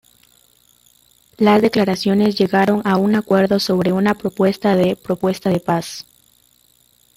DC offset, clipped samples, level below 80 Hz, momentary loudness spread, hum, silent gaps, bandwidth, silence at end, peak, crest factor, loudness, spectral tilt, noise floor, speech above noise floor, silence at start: under 0.1%; under 0.1%; -54 dBFS; 6 LU; none; none; 16 kHz; 1.15 s; -2 dBFS; 16 dB; -17 LUFS; -6.5 dB/octave; -56 dBFS; 40 dB; 1.4 s